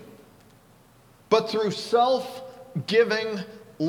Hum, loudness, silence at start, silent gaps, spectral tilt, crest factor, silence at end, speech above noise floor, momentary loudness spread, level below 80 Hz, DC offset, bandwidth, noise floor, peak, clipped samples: none; -24 LUFS; 0 s; none; -5 dB/octave; 20 dB; 0 s; 32 dB; 15 LU; -68 dBFS; under 0.1%; 14.5 kHz; -55 dBFS; -6 dBFS; under 0.1%